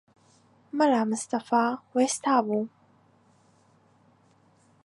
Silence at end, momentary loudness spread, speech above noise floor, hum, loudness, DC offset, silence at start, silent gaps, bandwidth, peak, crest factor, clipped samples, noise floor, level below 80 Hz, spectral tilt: 2.2 s; 8 LU; 37 dB; none; -26 LUFS; under 0.1%; 0.75 s; none; 11.5 kHz; -8 dBFS; 20 dB; under 0.1%; -62 dBFS; -80 dBFS; -4 dB/octave